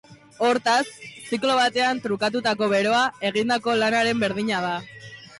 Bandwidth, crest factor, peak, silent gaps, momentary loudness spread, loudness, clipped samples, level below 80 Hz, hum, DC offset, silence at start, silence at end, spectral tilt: 11.5 kHz; 12 dB; -12 dBFS; none; 11 LU; -22 LUFS; under 0.1%; -64 dBFS; none; under 0.1%; 0.1 s; 0 s; -3.5 dB/octave